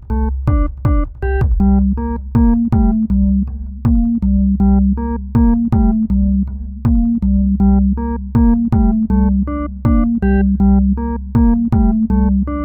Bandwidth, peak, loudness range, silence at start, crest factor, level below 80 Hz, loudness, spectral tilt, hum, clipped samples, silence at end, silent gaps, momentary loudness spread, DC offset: 2.9 kHz; -2 dBFS; 1 LU; 0 s; 12 dB; -18 dBFS; -15 LUFS; -12 dB/octave; none; under 0.1%; 0 s; none; 6 LU; 0.2%